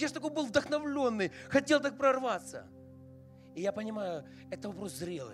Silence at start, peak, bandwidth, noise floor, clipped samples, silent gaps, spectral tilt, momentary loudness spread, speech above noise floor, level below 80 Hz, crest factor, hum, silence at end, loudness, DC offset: 0 s; -14 dBFS; 14 kHz; -54 dBFS; under 0.1%; none; -4.5 dB/octave; 19 LU; 21 dB; -72 dBFS; 20 dB; none; 0 s; -33 LUFS; under 0.1%